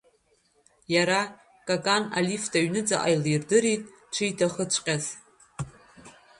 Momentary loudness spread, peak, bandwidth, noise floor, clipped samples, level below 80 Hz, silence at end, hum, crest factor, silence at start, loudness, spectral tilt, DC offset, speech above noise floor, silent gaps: 16 LU; -8 dBFS; 11.5 kHz; -67 dBFS; under 0.1%; -64 dBFS; 0.3 s; none; 20 dB; 0.9 s; -26 LUFS; -3.5 dB/octave; under 0.1%; 41 dB; none